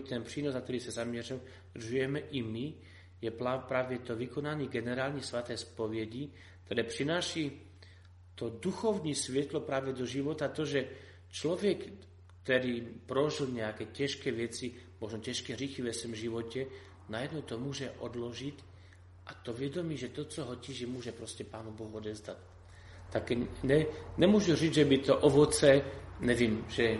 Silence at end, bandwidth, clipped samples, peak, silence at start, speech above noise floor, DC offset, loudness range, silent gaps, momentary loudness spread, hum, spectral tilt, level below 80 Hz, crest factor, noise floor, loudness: 0 s; 11.5 kHz; under 0.1%; -10 dBFS; 0 s; 22 dB; under 0.1%; 13 LU; none; 17 LU; none; -5 dB/octave; -60 dBFS; 24 dB; -56 dBFS; -34 LUFS